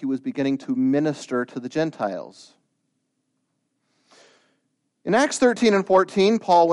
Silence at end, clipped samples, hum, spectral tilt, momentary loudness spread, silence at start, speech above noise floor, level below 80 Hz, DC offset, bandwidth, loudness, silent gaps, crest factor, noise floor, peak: 0 s; under 0.1%; none; -5 dB/octave; 11 LU; 0 s; 53 dB; -66 dBFS; under 0.1%; 11.5 kHz; -21 LUFS; none; 18 dB; -74 dBFS; -4 dBFS